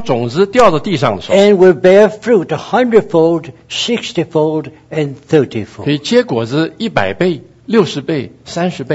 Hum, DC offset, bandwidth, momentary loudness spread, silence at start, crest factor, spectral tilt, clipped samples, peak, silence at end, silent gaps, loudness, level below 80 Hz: none; under 0.1%; 8.2 kHz; 12 LU; 0 s; 12 dB; -6 dB/octave; 0.4%; 0 dBFS; 0 s; none; -13 LUFS; -48 dBFS